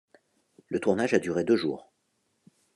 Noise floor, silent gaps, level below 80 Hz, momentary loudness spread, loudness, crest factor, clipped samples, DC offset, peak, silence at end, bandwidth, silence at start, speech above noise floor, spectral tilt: -75 dBFS; none; -70 dBFS; 9 LU; -27 LUFS; 20 dB; under 0.1%; under 0.1%; -8 dBFS; 0.95 s; 11.5 kHz; 0.7 s; 48 dB; -6 dB/octave